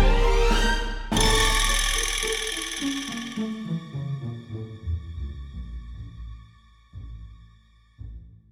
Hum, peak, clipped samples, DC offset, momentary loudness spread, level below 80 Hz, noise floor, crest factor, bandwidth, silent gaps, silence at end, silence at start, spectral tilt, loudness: none; -8 dBFS; under 0.1%; under 0.1%; 23 LU; -28 dBFS; -56 dBFS; 18 dB; 16 kHz; none; 0.2 s; 0 s; -3 dB/octave; -25 LUFS